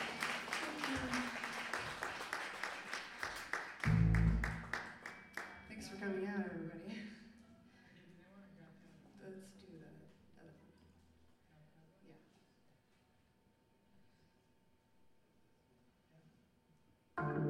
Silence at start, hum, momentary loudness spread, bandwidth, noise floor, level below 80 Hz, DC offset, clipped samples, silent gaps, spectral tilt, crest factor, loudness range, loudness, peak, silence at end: 0 s; none; 25 LU; 16 kHz; -74 dBFS; -52 dBFS; under 0.1%; under 0.1%; none; -5.5 dB/octave; 22 dB; 21 LU; -41 LUFS; -22 dBFS; 0 s